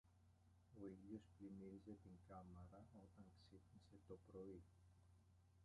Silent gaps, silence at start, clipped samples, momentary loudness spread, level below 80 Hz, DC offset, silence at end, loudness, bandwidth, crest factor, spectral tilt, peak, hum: none; 0.05 s; under 0.1%; 9 LU; -76 dBFS; under 0.1%; 0 s; -62 LUFS; 10.5 kHz; 20 dB; -8 dB/octave; -44 dBFS; none